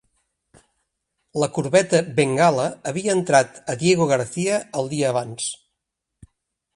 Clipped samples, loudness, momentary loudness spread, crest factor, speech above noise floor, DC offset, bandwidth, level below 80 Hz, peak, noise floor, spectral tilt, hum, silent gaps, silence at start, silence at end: under 0.1%; -21 LUFS; 10 LU; 20 dB; 60 dB; under 0.1%; 11.5 kHz; -62 dBFS; -2 dBFS; -81 dBFS; -4.5 dB/octave; none; none; 1.35 s; 1.2 s